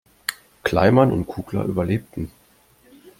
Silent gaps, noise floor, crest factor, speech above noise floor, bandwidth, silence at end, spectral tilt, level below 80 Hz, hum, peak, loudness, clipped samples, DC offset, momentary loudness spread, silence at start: none; -56 dBFS; 20 dB; 36 dB; 16.5 kHz; 0.9 s; -6.5 dB/octave; -48 dBFS; none; -2 dBFS; -21 LUFS; under 0.1%; under 0.1%; 17 LU; 0.3 s